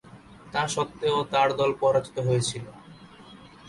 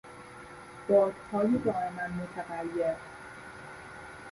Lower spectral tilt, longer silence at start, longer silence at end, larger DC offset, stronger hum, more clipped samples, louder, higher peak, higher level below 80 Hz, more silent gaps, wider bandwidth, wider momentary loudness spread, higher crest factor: second, -4.5 dB/octave vs -7 dB/octave; about the same, 0.05 s vs 0.05 s; about the same, 0 s vs 0 s; neither; neither; neither; first, -25 LUFS vs -30 LUFS; about the same, -10 dBFS vs -12 dBFS; about the same, -58 dBFS vs -62 dBFS; neither; about the same, 11.5 kHz vs 11.5 kHz; second, 9 LU vs 21 LU; about the same, 16 dB vs 20 dB